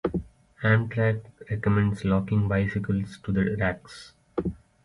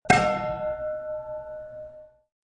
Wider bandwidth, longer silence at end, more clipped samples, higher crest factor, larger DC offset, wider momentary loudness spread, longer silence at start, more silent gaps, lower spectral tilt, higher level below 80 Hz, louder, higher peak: about the same, 10.5 kHz vs 10.5 kHz; about the same, 0.3 s vs 0.35 s; neither; second, 18 dB vs 24 dB; neither; second, 11 LU vs 20 LU; about the same, 0.05 s vs 0.05 s; neither; first, -8.5 dB/octave vs -4.5 dB/octave; about the same, -46 dBFS vs -50 dBFS; about the same, -27 LUFS vs -27 LUFS; second, -8 dBFS vs -4 dBFS